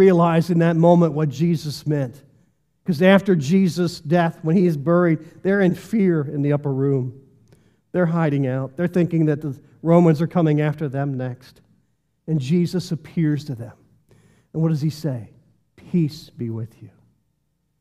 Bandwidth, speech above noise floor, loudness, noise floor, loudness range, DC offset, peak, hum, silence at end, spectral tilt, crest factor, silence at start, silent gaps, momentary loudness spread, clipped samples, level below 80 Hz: 13 kHz; 51 dB; -20 LUFS; -70 dBFS; 8 LU; under 0.1%; -2 dBFS; none; 0.95 s; -8 dB/octave; 18 dB; 0 s; none; 15 LU; under 0.1%; -62 dBFS